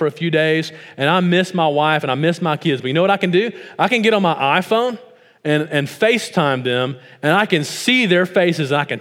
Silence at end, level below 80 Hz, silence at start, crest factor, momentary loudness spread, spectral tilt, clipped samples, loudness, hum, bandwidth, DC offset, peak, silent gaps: 0 s; -72 dBFS; 0 s; 16 dB; 6 LU; -5.5 dB/octave; under 0.1%; -17 LUFS; none; 16.5 kHz; under 0.1%; 0 dBFS; none